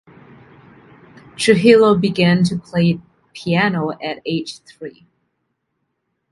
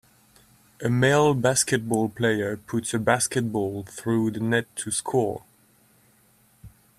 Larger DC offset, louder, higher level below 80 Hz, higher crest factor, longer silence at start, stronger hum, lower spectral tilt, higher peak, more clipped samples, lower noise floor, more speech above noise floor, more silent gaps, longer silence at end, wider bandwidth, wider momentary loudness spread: neither; first, -16 LUFS vs -24 LUFS; about the same, -56 dBFS vs -58 dBFS; about the same, 18 dB vs 20 dB; first, 1.4 s vs 0.8 s; neither; first, -6 dB/octave vs -4.5 dB/octave; first, 0 dBFS vs -4 dBFS; neither; first, -73 dBFS vs -60 dBFS; first, 57 dB vs 37 dB; neither; first, 1.4 s vs 0.3 s; second, 11.5 kHz vs 15 kHz; first, 22 LU vs 9 LU